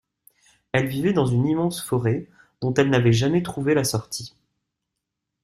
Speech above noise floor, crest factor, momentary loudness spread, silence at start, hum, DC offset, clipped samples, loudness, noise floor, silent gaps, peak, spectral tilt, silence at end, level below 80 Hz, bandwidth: 61 dB; 18 dB; 11 LU; 0.75 s; none; under 0.1%; under 0.1%; -22 LUFS; -82 dBFS; none; -6 dBFS; -6 dB/octave; 1.15 s; -54 dBFS; 14.5 kHz